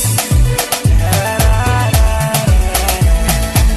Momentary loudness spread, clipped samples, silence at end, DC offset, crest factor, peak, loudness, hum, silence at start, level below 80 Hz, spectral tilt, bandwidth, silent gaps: 2 LU; under 0.1%; 0 s; under 0.1%; 10 dB; 0 dBFS; -13 LUFS; none; 0 s; -14 dBFS; -4.5 dB/octave; 13.5 kHz; none